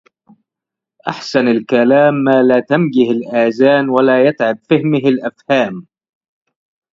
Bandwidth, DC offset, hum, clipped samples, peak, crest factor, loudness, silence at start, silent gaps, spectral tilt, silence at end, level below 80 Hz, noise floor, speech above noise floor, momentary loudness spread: 7.6 kHz; under 0.1%; none; under 0.1%; 0 dBFS; 14 dB; -13 LUFS; 1.05 s; none; -7 dB/octave; 1.1 s; -62 dBFS; -84 dBFS; 72 dB; 9 LU